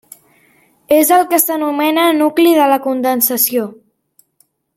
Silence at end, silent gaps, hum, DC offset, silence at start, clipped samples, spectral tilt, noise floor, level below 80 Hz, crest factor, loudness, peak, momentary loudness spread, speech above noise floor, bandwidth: 1 s; none; none; under 0.1%; 0.9 s; under 0.1%; -2 dB/octave; -59 dBFS; -64 dBFS; 14 dB; -13 LUFS; 0 dBFS; 5 LU; 46 dB; 17 kHz